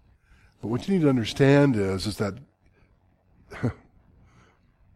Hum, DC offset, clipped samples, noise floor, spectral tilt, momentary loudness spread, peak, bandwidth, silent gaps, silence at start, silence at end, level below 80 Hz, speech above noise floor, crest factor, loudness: none; under 0.1%; under 0.1%; -62 dBFS; -7 dB/octave; 16 LU; -6 dBFS; 13 kHz; none; 0.65 s; 1.2 s; -54 dBFS; 40 dB; 20 dB; -24 LUFS